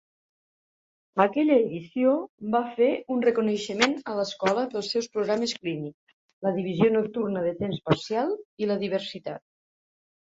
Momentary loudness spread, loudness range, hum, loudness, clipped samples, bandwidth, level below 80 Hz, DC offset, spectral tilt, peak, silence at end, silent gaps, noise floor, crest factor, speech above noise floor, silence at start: 9 LU; 3 LU; none; -26 LUFS; under 0.1%; 7.8 kHz; -66 dBFS; under 0.1%; -5.5 dB/octave; -4 dBFS; 0.9 s; 2.29-2.38 s, 5.94-6.07 s, 6.13-6.41 s, 8.45-8.57 s; under -90 dBFS; 22 dB; over 64 dB; 1.15 s